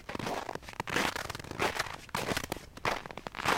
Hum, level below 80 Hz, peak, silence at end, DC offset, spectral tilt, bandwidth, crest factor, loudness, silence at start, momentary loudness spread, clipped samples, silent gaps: none; -54 dBFS; -14 dBFS; 0 s; under 0.1%; -3 dB/octave; 17 kHz; 22 dB; -35 LUFS; 0 s; 8 LU; under 0.1%; none